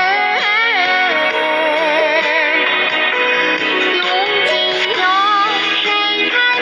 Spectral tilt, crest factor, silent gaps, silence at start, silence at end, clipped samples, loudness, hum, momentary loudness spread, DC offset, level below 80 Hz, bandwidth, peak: -2 dB/octave; 12 dB; none; 0 s; 0 s; under 0.1%; -13 LUFS; none; 2 LU; under 0.1%; -68 dBFS; 11 kHz; -2 dBFS